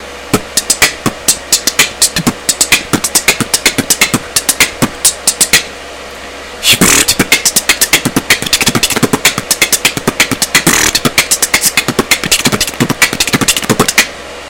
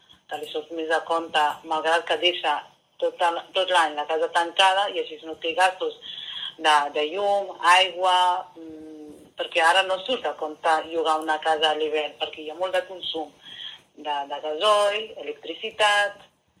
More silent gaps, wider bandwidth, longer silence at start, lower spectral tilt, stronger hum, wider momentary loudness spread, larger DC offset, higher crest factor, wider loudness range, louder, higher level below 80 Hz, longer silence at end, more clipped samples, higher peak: neither; first, over 20 kHz vs 14.5 kHz; second, 0 s vs 0.3 s; about the same, -1.5 dB/octave vs -1 dB/octave; neither; second, 5 LU vs 15 LU; first, 0.4% vs under 0.1%; second, 12 dB vs 20 dB; second, 1 LU vs 5 LU; first, -9 LUFS vs -23 LUFS; first, -36 dBFS vs -74 dBFS; second, 0 s vs 0.45 s; first, 1% vs under 0.1%; first, 0 dBFS vs -4 dBFS